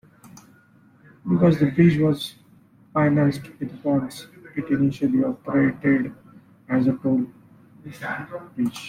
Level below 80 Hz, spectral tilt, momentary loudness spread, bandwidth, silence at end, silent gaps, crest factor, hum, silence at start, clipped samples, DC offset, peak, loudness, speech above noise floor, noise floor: -56 dBFS; -8 dB/octave; 16 LU; 15 kHz; 0 s; none; 18 dB; none; 0.25 s; under 0.1%; under 0.1%; -6 dBFS; -22 LUFS; 33 dB; -55 dBFS